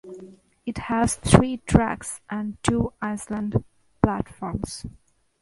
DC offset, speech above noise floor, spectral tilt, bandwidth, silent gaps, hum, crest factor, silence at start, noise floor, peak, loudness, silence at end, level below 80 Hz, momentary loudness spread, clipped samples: under 0.1%; 23 dB; -6 dB/octave; 11.5 kHz; none; none; 24 dB; 0.05 s; -47 dBFS; 0 dBFS; -24 LUFS; 0.5 s; -40 dBFS; 17 LU; under 0.1%